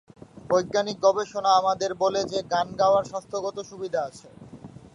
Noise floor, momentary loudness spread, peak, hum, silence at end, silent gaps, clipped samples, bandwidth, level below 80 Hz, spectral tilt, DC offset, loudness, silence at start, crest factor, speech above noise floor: -45 dBFS; 14 LU; -8 dBFS; none; 0.3 s; none; under 0.1%; 11 kHz; -62 dBFS; -4 dB/octave; under 0.1%; -25 LUFS; 0.35 s; 18 dB; 20 dB